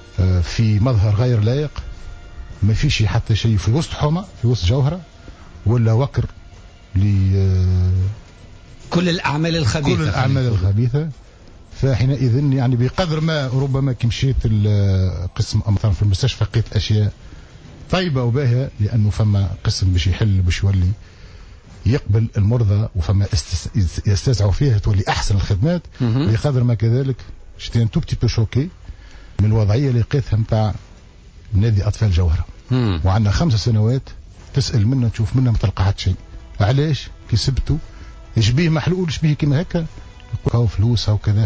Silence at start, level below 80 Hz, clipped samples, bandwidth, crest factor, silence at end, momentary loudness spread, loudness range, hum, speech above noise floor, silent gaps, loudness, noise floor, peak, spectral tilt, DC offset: 0 s; -28 dBFS; under 0.1%; 8 kHz; 12 dB; 0 s; 7 LU; 2 LU; none; 25 dB; none; -18 LUFS; -42 dBFS; -6 dBFS; -6.5 dB/octave; under 0.1%